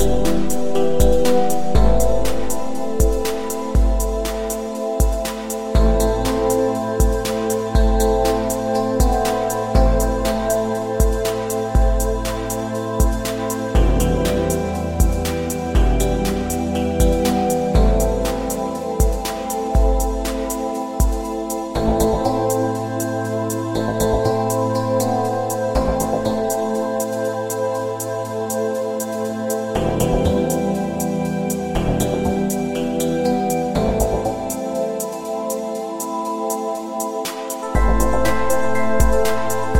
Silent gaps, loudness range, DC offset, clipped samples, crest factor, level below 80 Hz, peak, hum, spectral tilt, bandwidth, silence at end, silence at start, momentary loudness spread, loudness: none; 3 LU; under 0.1%; under 0.1%; 16 dB; -24 dBFS; -2 dBFS; none; -5.5 dB/octave; 16.5 kHz; 0 s; 0 s; 6 LU; -20 LUFS